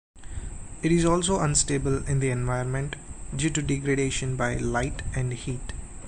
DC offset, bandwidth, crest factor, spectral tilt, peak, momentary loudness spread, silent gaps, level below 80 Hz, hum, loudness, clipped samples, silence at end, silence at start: under 0.1%; 11 kHz; 18 dB; -5 dB/octave; -10 dBFS; 16 LU; none; -38 dBFS; none; -26 LUFS; under 0.1%; 0 s; 0.15 s